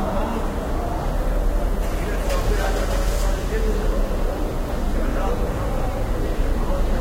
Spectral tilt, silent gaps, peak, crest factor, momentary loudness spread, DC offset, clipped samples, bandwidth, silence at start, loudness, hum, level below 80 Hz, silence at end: -6 dB/octave; none; -8 dBFS; 12 dB; 3 LU; under 0.1%; under 0.1%; 16 kHz; 0 s; -25 LUFS; none; -22 dBFS; 0 s